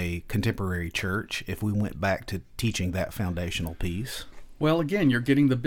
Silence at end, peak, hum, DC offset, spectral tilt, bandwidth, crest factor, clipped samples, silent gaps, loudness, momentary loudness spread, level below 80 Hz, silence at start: 0 s; -10 dBFS; none; under 0.1%; -6 dB/octave; 18 kHz; 16 dB; under 0.1%; none; -28 LUFS; 9 LU; -44 dBFS; 0 s